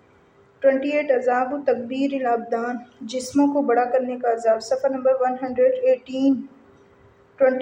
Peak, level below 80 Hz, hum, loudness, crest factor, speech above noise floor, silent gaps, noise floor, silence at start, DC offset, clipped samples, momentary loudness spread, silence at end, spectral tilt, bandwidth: -6 dBFS; -68 dBFS; none; -22 LUFS; 16 dB; 34 dB; none; -55 dBFS; 0.6 s; under 0.1%; under 0.1%; 7 LU; 0 s; -4.5 dB/octave; 10.5 kHz